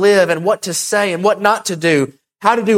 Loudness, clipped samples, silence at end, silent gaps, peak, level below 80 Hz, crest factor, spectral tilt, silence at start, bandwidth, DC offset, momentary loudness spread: -15 LUFS; under 0.1%; 0 s; none; 0 dBFS; -60 dBFS; 14 dB; -4 dB/octave; 0 s; 16.5 kHz; under 0.1%; 4 LU